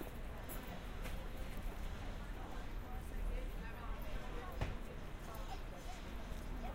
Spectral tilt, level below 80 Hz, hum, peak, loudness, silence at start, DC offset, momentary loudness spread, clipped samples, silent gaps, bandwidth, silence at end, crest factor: -5.5 dB/octave; -46 dBFS; none; -26 dBFS; -49 LUFS; 0 s; under 0.1%; 4 LU; under 0.1%; none; 16 kHz; 0 s; 18 dB